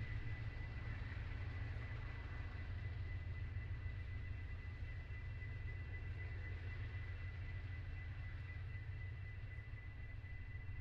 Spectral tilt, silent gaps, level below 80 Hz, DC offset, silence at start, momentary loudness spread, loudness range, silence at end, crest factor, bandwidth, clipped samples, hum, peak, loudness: -6 dB/octave; none; -52 dBFS; under 0.1%; 0 s; 4 LU; 2 LU; 0 s; 12 dB; 6.2 kHz; under 0.1%; none; -34 dBFS; -49 LUFS